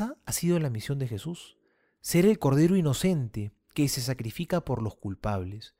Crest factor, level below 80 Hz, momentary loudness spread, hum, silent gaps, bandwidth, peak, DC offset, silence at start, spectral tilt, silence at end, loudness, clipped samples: 18 dB; -52 dBFS; 13 LU; none; none; 16 kHz; -10 dBFS; under 0.1%; 0 s; -6 dB/octave; 0.1 s; -28 LUFS; under 0.1%